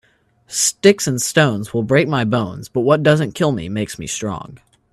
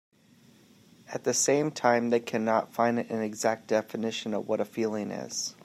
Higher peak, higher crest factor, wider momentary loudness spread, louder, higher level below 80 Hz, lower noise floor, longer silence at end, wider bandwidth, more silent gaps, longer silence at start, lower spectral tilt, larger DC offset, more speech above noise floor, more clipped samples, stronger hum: first, 0 dBFS vs -8 dBFS; about the same, 18 dB vs 22 dB; about the same, 10 LU vs 8 LU; first, -17 LUFS vs -28 LUFS; first, -52 dBFS vs -78 dBFS; second, -53 dBFS vs -59 dBFS; first, 0.35 s vs 0.15 s; second, 14 kHz vs 16 kHz; neither; second, 0.5 s vs 1.1 s; about the same, -4.5 dB/octave vs -3.5 dB/octave; neither; first, 36 dB vs 31 dB; neither; neither